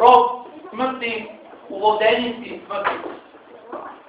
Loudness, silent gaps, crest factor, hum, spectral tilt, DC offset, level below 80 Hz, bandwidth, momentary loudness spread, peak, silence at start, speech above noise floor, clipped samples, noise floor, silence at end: -20 LUFS; none; 20 dB; none; -0.5 dB/octave; under 0.1%; -62 dBFS; 6 kHz; 20 LU; 0 dBFS; 0 s; 18 dB; under 0.1%; -40 dBFS; 0.1 s